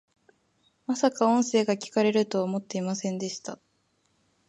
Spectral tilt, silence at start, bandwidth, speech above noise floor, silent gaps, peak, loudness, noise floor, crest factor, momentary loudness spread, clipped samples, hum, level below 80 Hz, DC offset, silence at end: -5 dB/octave; 0.9 s; 11.5 kHz; 45 dB; none; -8 dBFS; -27 LUFS; -71 dBFS; 20 dB; 15 LU; under 0.1%; none; -78 dBFS; under 0.1%; 0.95 s